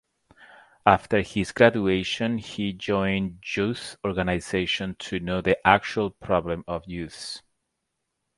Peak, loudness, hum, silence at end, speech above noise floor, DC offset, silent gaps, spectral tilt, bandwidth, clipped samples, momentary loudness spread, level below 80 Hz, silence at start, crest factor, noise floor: 0 dBFS; -25 LUFS; none; 1 s; 55 dB; under 0.1%; none; -5.5 dB/octave; 11.5 kHz; under 0.1%; 13 LU; -48 dBFS; 0.4 s; 26 dB; -80 dBFS